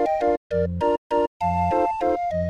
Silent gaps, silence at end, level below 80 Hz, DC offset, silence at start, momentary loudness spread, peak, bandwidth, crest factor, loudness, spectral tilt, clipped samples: 0.37-0.50 s, 0.98-1.10 s, 1.27-1.40 s; 0 s; -44 dBFS; under 0.1%; 0 s; 2 LU; -10 dBFS; 10.5 kHz; 12 dB; -23 LUFS; -8 dB/octave; under 0.1%